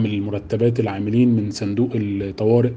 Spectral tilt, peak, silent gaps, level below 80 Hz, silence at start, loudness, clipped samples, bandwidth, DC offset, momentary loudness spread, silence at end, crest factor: -8 dB/octave; -6 dBFS; none; -52 dBFS; 0 s; -20 LUFS; under 0.1%; 8.6 kHz; under 0.1%; 7 LU; 0 s; 14 dB